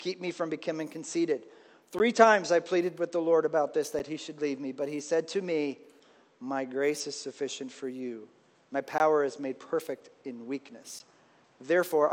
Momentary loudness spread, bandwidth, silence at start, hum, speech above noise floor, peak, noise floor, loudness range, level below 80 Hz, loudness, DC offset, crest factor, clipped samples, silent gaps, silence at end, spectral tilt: 15 LU; 17 kHz; 0 s; none; 31 dB; -6 dBFS; -61 dBFS; 7 LU; -78 dBFS; -30 LUFS; under 0.1%; 24 dB; under 0.1%; none; 0 s; -4 dB/octave